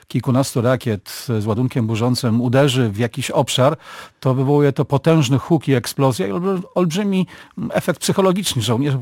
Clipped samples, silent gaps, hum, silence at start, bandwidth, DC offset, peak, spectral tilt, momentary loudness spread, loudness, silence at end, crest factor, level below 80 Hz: under 0.1%; none; none; 0.1 s; 17 kHz; under 0.1%; -2 dBFS; -6 dB/octave; 7 LU; -18 LUFS; 0 s; 16 dB; -54 dBFS